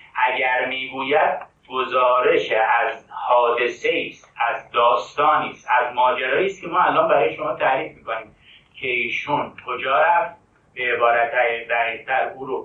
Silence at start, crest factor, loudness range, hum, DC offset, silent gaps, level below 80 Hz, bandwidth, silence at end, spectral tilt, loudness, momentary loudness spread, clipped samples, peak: 0.15 s; 16 dB; 3 LU; none; under 0.1%; none; -64 dBFS; 7.6 kHz; 0 s; -4.5 dB/octave; -20 LUFS; 10 LU; under 0.1%; -4 dBFS